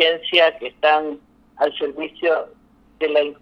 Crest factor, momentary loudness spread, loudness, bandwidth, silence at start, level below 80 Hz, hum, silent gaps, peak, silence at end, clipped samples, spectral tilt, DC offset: 20 dB; 12 LU; -19 LUFS; 6.2 kHz; 0 s; -62 dBFS; none; none; -2 dBFS; 0.1 s; under 0.1%; -4 dB/octave; under 0.1%